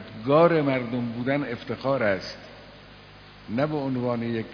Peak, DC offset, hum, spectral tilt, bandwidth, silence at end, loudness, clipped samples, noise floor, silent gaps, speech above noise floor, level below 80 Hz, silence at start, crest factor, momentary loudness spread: -6 dBFS; under 0.1%; 50 Hz at -50 dBFS; -8 dB/octave; 5.4 kHz; 0 s; -25 LUFS; under 0.1%; -48 dBFS; none; 23 dB; -58 dBFS; 0 s; 20 dB; 19 LU